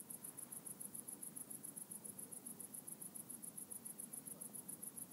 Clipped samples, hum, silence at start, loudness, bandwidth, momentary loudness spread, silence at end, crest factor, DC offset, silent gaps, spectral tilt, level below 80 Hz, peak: under 0.1%; none; 0 s; -50 LUFS; 16 kHz; 1 LU; 0 s; 20 dB; under 0.1%; none; -2.5 dB/octave; under -90 dBFS; -32 dBFS